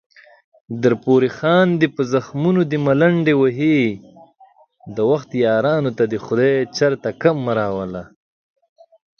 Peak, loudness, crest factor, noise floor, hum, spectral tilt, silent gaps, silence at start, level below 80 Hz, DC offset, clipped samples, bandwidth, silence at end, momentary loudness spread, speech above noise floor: -2 dBFS; -18 LUFS; 18 dB; -51 dBFS; none; -7 dB/octave; none; 0.7 s; -58 dBFS; under 0.1%; under 0.1%; 6.8 kHz; 1.15 s; 8 LU; 34 dB